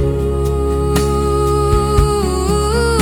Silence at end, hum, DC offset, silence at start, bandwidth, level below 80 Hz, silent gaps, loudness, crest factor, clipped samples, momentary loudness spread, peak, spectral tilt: 0 s; none; under 0.1%; 0 s; 18 kHz; -20 dBFS; none; -15 LUFS; 12 dB; under 0.1%; 3 LU; -2 dBFS; -6 dB/octave